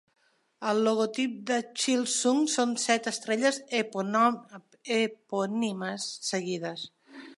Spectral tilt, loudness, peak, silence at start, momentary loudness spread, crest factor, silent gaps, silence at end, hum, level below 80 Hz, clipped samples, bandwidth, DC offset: -3 dB/octave; -28 LUFS; -10 dBFS; 0.6 s; 10 LU; 20 dB; none; 0.05 s; none; -84 dBFS; under 0.1%; 11.5 kHz; under 0.1%